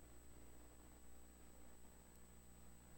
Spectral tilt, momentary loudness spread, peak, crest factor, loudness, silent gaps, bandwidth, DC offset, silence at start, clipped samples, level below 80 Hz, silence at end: -4 dB/octave; 1 LU; -44 dBFS; 16 dB; -65 LUFS; none; 17 kHz; under 0.1%; 0 s; under 0.1%; -68 dBFS; 0 s